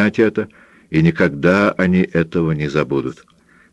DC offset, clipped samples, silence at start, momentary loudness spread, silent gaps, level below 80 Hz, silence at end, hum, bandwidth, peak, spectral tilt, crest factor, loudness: under 0.1%; under 0.1%; 0 s; 8 LU; none; -46 dBFS; 0.6 s; none; 8.2 kHz; 0 dBFS; -8 dB/octave; 16 dB; -17 LUFS